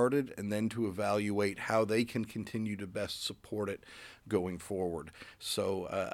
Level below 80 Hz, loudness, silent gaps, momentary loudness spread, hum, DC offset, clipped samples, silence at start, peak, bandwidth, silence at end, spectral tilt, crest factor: -66 dBFS; -35 LUFS; none; 9 LU; none; under 0.1%; under 0.1%; 0 s; -16 dBFS; 17 kHz; 0 s; -5 dB/octave; 18 dB